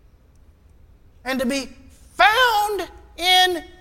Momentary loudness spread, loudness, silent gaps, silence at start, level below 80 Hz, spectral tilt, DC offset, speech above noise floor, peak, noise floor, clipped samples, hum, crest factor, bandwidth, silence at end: 20 LU; -18 LUFS; none; 1.25 s; -48 dBFS; -1.5 dB/octave; under 0.1%; 30 dB; 0 dBFS; -52 dBFS; under 0.1%; none; 20 dB; 17 kHz; 0.15 s